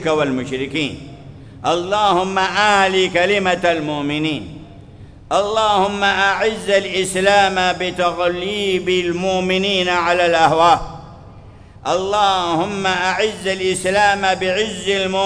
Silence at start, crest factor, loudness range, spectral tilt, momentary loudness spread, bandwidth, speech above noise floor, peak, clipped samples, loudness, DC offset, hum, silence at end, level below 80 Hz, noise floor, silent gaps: 0 s; 18 dB; 2 LU; -3.5 dB/octave; 8 LU; 11 kHz; 23 dB; 0 dBFS; under 0.1%; -17 LUFS; under 0.1%; none; 0 s; -44 dBFS; -40 dBFS; none